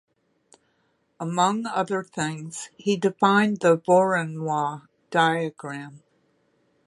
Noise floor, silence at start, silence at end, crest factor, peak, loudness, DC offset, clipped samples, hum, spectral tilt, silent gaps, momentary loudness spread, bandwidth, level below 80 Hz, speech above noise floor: -69 dBFS; 1.2 s; 0.9 s; 20 dB; -4 dBFS; -23 LUFS; under 0.1%; under 0.1%; none; -5 dB/octave; none; 16 LU; 11.5 kHz; -72 dBFS; 46 dB